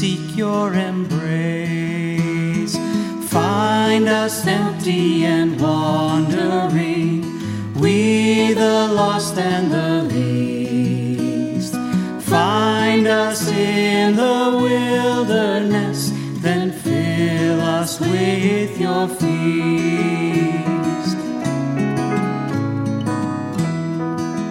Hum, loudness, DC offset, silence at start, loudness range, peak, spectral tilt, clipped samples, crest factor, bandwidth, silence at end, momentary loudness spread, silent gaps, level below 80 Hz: none; -18 LUFS; under 0.1%; 0 s; 4 LU; -2 dBFS; -5.5 dB/octave; under 0.1%; 16 dB; 16.5 kHz; 0 s; 6 LU; none; -58 dBFS